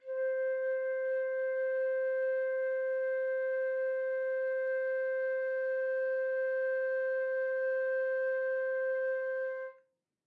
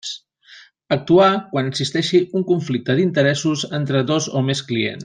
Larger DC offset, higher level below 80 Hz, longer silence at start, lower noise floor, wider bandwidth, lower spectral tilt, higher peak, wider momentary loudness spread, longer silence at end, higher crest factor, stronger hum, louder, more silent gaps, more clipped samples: neither; second, under -90 dBFS vs -60 dBFS; about the same, 0.05 s vs 0.05 s; first, -70 dBFS vs -47 dBFS; second, 4.1 kHz vs 9.8 kHz; second, -2 dB/octave vs -5.5 dB/octave; second, -26 dBFS vs -2 dBFS; second, 1 LU vs 8 LU; first, 0.55 s vs 0 s; second, 6 dB vs 16 dB; neither; second, -33 LUFS vs -19 LUFS; neither; neither